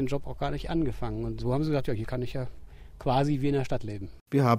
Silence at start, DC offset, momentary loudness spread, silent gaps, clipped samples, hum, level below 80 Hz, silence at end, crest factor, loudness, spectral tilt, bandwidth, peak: 0 s; under 0.1%; 9 LU; 4.21-4.26 s; under 0.1%; none; -42 dBFS; 0 s; 20 dB; -30 LUFS; -8 dB/octave; 15.5 kHz; -8 dBFS